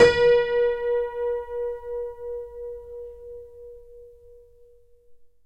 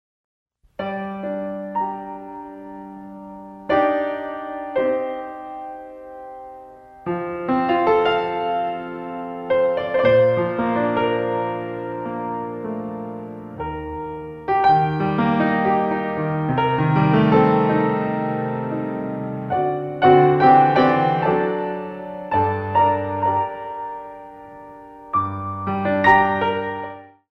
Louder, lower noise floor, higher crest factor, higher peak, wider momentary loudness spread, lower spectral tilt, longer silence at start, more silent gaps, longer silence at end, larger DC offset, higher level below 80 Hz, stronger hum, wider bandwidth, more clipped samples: second, -24 LUFS vs -20 LUFS; first, -53 dBFS vs -42 dBFS; about the same, 22 dB vs 20 dB; about the same, -4 dBFS vs -2 dBFS; first, 24 LU vs 21 LU; second, -4 dB/octave vs -9 dB/octave; second, 0 s vs 0.8 s; neither; about the same, 0.2 s vs 0.25 s; neither; about the same, -50 dBFS vs -52 dBFS; neither; first, 9 kHz vs 6.2 kHz; neither